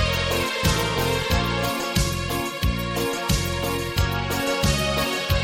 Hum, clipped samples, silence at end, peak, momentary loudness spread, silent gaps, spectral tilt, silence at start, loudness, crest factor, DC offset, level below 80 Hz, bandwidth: none; under 0.1%; 0 s; -8 dBFS; 4 LU; none; -4 dB/octave; 0 s; -23 LUFS; 16 dB; under 0.1%; -32 dBFS; 17 kHz